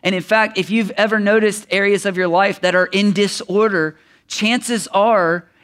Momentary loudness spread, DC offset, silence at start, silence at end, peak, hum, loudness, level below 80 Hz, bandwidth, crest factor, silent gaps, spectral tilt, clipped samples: 4 LU; under 0.1%; 0.05 s; 0.25 s; 0 dBFS; none; -16 LUFS; -66 dBFS; 15 kHz; 16 dB; none; -4.5 dB/octave; under 0.1%